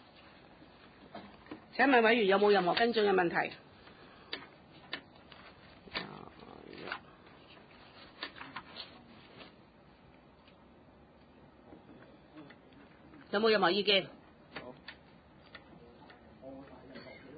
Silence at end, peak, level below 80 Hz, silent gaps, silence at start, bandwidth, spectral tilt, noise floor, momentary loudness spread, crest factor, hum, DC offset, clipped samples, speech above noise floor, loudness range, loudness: 0 s; -14 dBFS; -70 dBFS; none; 1.15 s; 4.9 kHz; -1.5 dB/octave; -60 dBFS; 28 LU; 22 dB; none; under 0.1%; under 0.1%; 32 dB; 20 LU; -31 LUFS